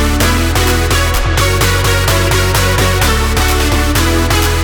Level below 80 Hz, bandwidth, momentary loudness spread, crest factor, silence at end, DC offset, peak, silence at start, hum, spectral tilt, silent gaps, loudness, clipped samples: -16 dBFS; over 20 kHz; 1 LU; 10 dB; 0 s; under 0.1%; 0 dBFS; 0 s; none; -4 dB/octave; none; -12 LUFS; under 0.1%